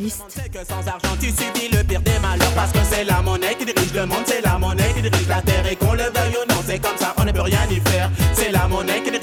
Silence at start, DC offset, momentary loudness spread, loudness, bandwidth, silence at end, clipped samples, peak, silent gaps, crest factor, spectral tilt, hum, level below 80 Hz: 0 s; under 0.1%; 5 LU; -19 LUFS; 19 kHz; 0 s; under 0.1%; -2 dBFS; none; 16 dB; -4.5 dB/octave; none; -28 dBFS